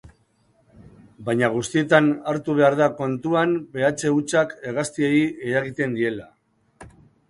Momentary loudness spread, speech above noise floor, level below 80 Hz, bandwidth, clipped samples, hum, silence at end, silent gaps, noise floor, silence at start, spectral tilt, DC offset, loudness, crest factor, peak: 9 LU; 41 dB; -60 dBFS; 11.5 kHz; under 0.1%; none; 0.4 s; none; -62 dBFS; 0.05 s; -5.5 dB/octave; under 0.1%; -21 LUFS; 20 dB; -2 dBFS